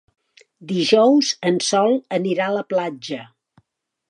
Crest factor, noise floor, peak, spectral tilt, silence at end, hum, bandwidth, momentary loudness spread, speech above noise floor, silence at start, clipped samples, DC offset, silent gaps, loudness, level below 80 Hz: 18 dB; -69 dBFS; -2 dBFS; -4 dB/octave; 0.85 s; none; 11 kHz; 14 LU; 51 dB; 0.6 s; under 0.1%; under 0.1%; none; -19 LUFS; -74 dBFS